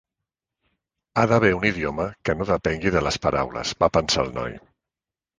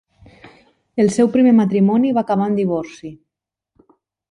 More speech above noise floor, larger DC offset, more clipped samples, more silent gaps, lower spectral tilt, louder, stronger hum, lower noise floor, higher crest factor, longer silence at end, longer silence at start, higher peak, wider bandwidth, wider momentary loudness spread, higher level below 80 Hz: about the same, 68 dB vs 68 dB; neither; neither; neither; second, -5 dB/octave vs -7.5 dB/octave; second, -22 LUFS vs -16 LUFS; neither; first, -90 dBFS vs -83 dBFS; first, 22 dB vs 14 dB; second, 0.8 s vs 1.15 s; first, 1.15 s vs 0.95 s; about the same, -2 dBFS vs -4 dBFS; about the same, 10 kHz vs 11 kHz; second, 9 LU vs 18 LU; first, -44 dBFS vs -58 dBFS